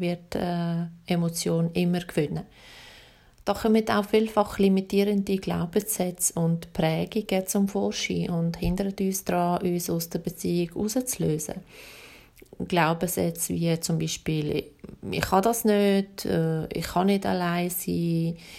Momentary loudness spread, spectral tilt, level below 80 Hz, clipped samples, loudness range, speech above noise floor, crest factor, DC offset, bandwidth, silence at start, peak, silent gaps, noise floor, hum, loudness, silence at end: 9 LU; -5.5 dB/octave; -50 dBFS; under 0.1%; 4 LU; 27 dB; 20 dB; under 0.1%; 16 kHz; 0 s; -6 dBFS; none; -53 dBFS; none; -26 LUFS; 0 s